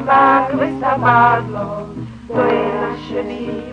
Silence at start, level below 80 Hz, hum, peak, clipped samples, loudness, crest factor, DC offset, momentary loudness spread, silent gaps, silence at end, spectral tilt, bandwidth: 0 s; -44 dBFS; none; 0 dBFS; under 0.1%; -16 LUFS; 16 dB; under 0.1%; 14 LU; none; 0 s; -7.5 dB/octave; 9.6 kHz